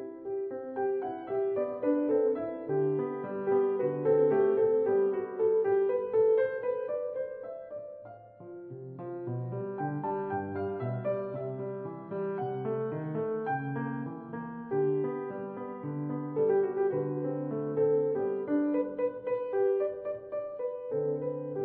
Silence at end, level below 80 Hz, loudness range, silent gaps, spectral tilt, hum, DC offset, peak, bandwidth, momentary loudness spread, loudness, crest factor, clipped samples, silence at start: 0 s; -74 dBFS; 8 LU; none; -12 dB/octave; none; under 0.1%; -14 dBFS; 3.4 kHz; 13 LU; -31 LUFS; 16 dB; under 0.1%; 0 s